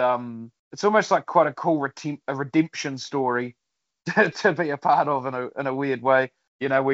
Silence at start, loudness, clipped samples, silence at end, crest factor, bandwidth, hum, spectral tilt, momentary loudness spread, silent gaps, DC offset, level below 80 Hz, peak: 0 s; -23 LUFS; under 0.1%; 0 s; 20 dB; 8 kHz; none; -4 dB/octave; 11 LU; 0.59-0.71 s, 6.48-6.59 s; under 0.1%; -74 dBFS; -4 dBFS